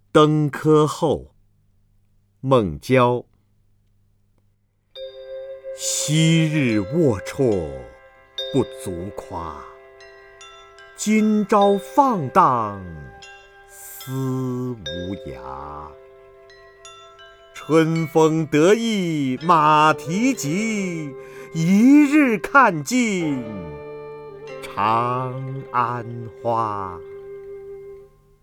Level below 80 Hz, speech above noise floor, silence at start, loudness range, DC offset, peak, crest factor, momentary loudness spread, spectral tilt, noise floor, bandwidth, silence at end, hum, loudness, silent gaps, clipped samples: -52 dBFS; 44 dB; 0.15 s; 12 LU; under 0.1%; 0 dBFS; 20 dB; 21 LU; -5.5 dB/octave; -63 dBFS; 19 kHz; 0.4 s; 50 Hz at -50 dBFS; -19 LUFS; none; under 0.1%